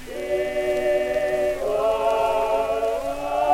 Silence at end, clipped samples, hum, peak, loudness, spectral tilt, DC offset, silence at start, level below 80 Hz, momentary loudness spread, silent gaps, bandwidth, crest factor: 0 s; under 0.1%; none; -8 dBFS; -23 LUFS; -4.5 dB/octave; under 0.1%; 0 s; -44 dBFS; 4 LU; none; 16.5 kHz; 14 dB